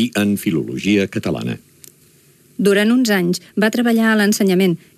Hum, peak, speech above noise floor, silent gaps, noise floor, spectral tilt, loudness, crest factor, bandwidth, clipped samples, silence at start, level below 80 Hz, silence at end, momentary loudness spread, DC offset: none; -4 dBFS; 35 dB; none; -51 dBFS; -5 dB/octave; -17 LUFS; 14 dB; 15 kHz; under 0.1%; 0 s; -58 dBFS; 0.2 s; 9 LU; under 0.1%